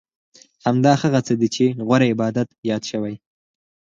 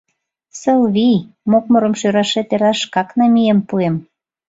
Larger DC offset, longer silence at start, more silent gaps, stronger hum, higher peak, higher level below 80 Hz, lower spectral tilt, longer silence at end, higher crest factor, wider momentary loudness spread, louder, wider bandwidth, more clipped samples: neither; about the same, 0.65 s vs 0.55 s; first, 2.58-2.63 s vs none; neither; about the same, -2 dBFS vs -2 dBFS; about the same, -60 dBFS vs -58 dBFS; about the same, -6.5 dB/octave vs -5.5 dB/octave; first, 0.8 s vs 0.45 s; about the same, 18 dB vs 14 dB; first, 10 LU vs 6 LU; second, -20 LUFS vs -15 LUFS; about the same, 7.6 kHz vs 7.8 kHz; neither